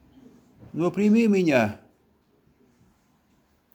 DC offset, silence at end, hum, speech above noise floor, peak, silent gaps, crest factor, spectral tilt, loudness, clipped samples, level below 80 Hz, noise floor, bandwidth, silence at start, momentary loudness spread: under 0.1%; 2 s; none; 44 dB; -6 dBFS; none; 20 dB; -7 dB/octave; -22 LUFS; under 0.1%; -66 dBFS; -65 dBFS; 19 kHz; 0.75 s; 16 LU